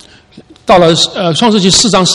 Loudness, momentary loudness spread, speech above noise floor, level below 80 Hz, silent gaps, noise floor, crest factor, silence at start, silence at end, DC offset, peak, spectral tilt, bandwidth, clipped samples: -8 LUFS; 4 LU; 31 dB; -38 dBFS; none; -39 dBFS; 10 dB; 0.35 s; 0 s; under 0.1%; 0 dBFS; -3.5 dB/octave; 12 kHz; 0.9%